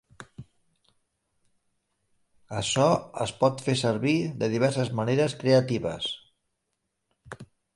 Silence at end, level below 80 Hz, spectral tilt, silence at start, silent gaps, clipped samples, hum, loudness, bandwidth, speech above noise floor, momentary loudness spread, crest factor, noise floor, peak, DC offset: 0.3 s; -60 dBFS; -5.5 dB/octave; 0.2 s; none; under 0.1%; none; -26 LUFS; 11.5 kHz; 55 dB; 23 LU; 20 dB; -80 dBFS; -8 dBFS; under 0.1%